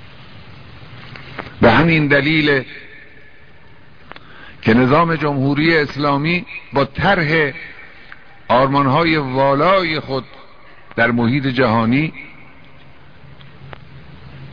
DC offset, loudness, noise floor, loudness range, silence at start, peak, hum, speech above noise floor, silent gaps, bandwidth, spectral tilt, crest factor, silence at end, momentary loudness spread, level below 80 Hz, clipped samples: 1%; -15 LUFS; -46 dBFS; 3 LU; 0 s; 0 dBFS; none; 30 dB; none; 5.4 kHz; -8 dB/octave; 18 dB; 0 s; 22 LU; -42 dBFS; under 0.1%